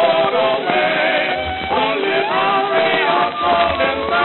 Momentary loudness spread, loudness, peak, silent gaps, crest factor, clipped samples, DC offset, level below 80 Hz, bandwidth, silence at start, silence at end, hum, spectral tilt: 3 LU; -16 LUFS; 0 dBFS; none; 16 dB; under 0.1%; under 0.1%; -44 dBFS; 4.3 kHz; 0 s; 0 s; none; -9 dB/octave